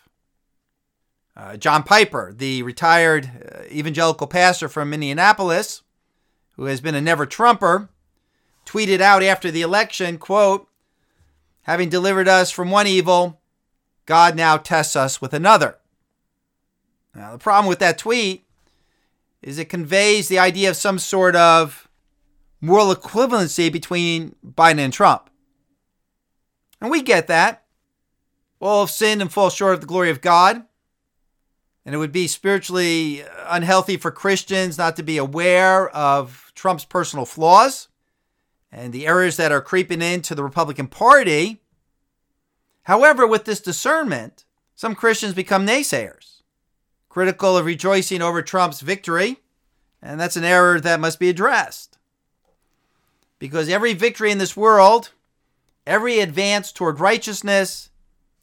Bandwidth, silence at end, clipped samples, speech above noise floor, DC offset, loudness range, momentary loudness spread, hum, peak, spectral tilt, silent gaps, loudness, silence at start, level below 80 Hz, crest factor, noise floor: 18.5 kHz; 0.6 s; under 0.1%; 57 dB; under 0.1%; 5 LU; 13 LU; none; 0 dBFS; -3.5 dB/octave; none; -17 LUFS; 1.4 s; -64 dBFS; 18 dB; -74 dBFS